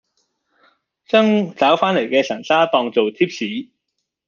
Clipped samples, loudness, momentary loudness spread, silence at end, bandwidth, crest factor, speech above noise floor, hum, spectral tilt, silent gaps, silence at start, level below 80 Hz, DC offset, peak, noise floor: under 0.1%; -17 LUFS; 7 LU; 0.65 s; 7.2 kHz; 18 dB; 60 dB; none; -5.5 dB/octave; none; 1.15 s; -66 dBFS; under 0.1%; -2 dBFS; -76 dBFS